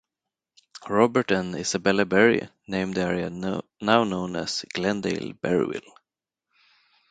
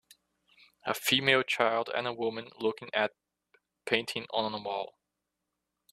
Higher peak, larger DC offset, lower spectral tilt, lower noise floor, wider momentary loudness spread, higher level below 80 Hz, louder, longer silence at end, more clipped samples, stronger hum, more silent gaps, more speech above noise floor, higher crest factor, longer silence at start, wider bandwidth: first, -2 dBFS vs -8 dBFS; neither; first, -5 dB/octave vs -3 dB/octave; about the same, -87 dBFS vs -85 dBFS; about the same, 10 LU vs 11 LU; first, -58 dBFS vs -74 dBFS; first, -24 LUFS vs -30 LUFS; first, 1.3 s vs 1.05 s; neither; neither; neither; first, 63 dB vs 54 dB; about the same, 24 dB vs 24 dB; about the same, 0.75 s vs 0.85 s; second, 9.4 kHz vs 14 kHz